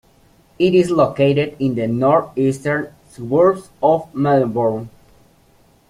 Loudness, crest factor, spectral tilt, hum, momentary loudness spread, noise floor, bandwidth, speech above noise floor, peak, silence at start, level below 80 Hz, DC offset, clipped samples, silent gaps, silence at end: -17 LUFS; 16 dB; -7.5 dB/octave; none; 8 LU; -53 dBFS; 13 kHz; 37 dB; -2 dBFS; 0.6 s; -54 dBFS; under 0.1%; under 0.1%; none; 1 s